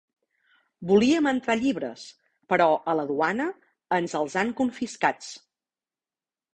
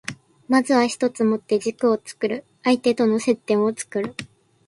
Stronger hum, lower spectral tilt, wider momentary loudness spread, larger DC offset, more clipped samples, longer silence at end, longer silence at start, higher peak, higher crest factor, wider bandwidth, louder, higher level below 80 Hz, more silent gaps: neither; about the same, -5 dB/octave vs -4.5 dB/octave; first, 17 LU vs 8 LU; neither; neither; first, 1.15 s vs 0.4 s; first, 0.8 s vs 0.1 s; second, -8 dBFS vs -4 dBFS; about the same, 20 dB vs 18 dB; second, 9.6 kHz vs 11.5 kHz; second, -25 LUFS vs -21 LUFS; about the same, -66 dBFS vs -66 dBFS; neither